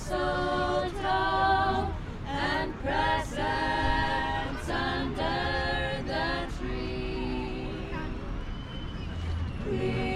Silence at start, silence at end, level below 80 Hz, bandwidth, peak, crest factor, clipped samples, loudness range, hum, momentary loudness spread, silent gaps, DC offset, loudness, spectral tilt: 0 s; 0 s; -38 dBFS; 13 kHz; -14 dBFS; 16 dB; under 0.1%; 6 LU; none; 10 LU; none; under 0.1%; -30 LUFS; -5.5 dB/octave